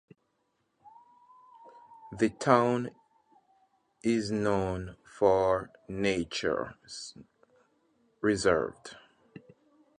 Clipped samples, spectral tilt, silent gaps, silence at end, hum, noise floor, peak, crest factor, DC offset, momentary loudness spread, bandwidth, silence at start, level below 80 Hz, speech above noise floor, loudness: under 0.1%; -5.5 dB/octave; none; 1 s; none; -77 dBFS; -6 dBFS; 26 dB; under 0.1%; 18 LU; 10.5 kHz; 0.85 s; -58 dBFS; 48 dB; -29 LUFS